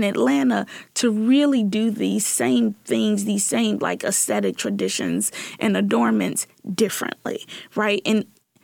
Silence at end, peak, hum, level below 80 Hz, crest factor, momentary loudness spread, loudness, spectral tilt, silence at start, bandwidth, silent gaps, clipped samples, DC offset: 0.4 s; -8 dBFS; none; -70 dBFS; 14 dB; 8 LU; -21 LUFS; -4 dB/octave; 0 s; 18.5 kHz; none; under 0.1%; under 0.1%